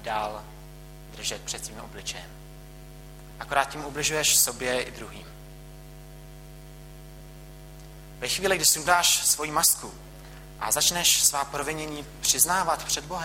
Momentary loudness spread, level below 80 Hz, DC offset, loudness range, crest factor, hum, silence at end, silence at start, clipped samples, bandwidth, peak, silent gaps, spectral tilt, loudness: 22 LU; -48 dBFS; under 0.1%; 14 LU; 24 dB; none; 0 s; 0 s; under 0.1%; 16.5 kHz; -4 dBFS; none; -0.5 dB/octave; -23 LUFS